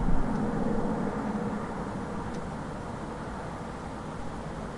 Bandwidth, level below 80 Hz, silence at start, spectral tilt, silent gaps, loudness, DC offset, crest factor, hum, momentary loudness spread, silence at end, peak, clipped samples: 11 kHz; -38 dBFS; 0 s; -7.5 dB/octave; none; -34 LUFS; under 0.1%; 18 dB; none; 8 LU; 0 s; -12 dBFS; under 0.1%